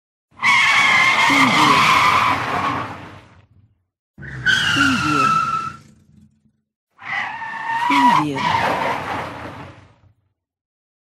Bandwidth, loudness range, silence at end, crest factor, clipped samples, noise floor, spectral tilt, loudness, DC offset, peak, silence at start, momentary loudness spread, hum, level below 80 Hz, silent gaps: 15.5 kHz; 7 LU; 1.3 s; 16 dB; under 0.1%; -67 dBFS; -3 dB/octave; -16 LUFS; under 0.1%; -2 dBFS; 0.4 s; 19 LU; none; -52 dBFS; 3.99-4.14 s, 6.76-6.87 s